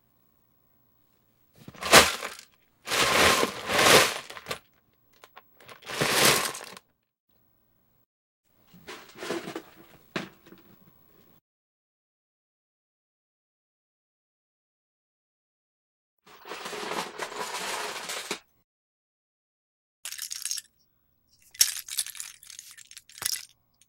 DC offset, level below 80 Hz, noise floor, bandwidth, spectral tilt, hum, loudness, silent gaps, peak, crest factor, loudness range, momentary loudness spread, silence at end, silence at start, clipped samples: under 0.1%; -58 dBFS; -69 dBFS; 16.5 kHz; -1 dB/octave; none; -25 LUFS; 7.20-7.28 s, 8.06-8.43 s, 11.41-16.17 s, 18.64-20.03 s; 0 dBFS; 32 dB; 20 LU; 26 LU; 0.4 s; 1.75 s; under 0.1%